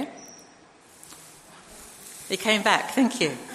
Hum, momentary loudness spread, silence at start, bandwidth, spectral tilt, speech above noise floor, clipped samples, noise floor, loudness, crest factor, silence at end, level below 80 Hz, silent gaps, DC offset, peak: none; 24 LU; 0 s; 14 kHz; -3 dB/octave; 29 dB; under 0.1%; -53 dBFS; -23 LUFS; 24 dB; 0 s; -68 dBFS; none; under 0.1%; -4 dBFS